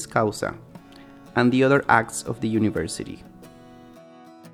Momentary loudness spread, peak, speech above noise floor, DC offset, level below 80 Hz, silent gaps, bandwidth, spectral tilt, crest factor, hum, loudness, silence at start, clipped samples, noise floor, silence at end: 17 LU; -2 dBFS; 25 dB; under 0.1%; -56 dBFS; none; 15 kHz; -5.5 dB/octave; 24 dB; none; -22 LUFS; 0 s; under 0.1%; -47 dBFS; 0.05 s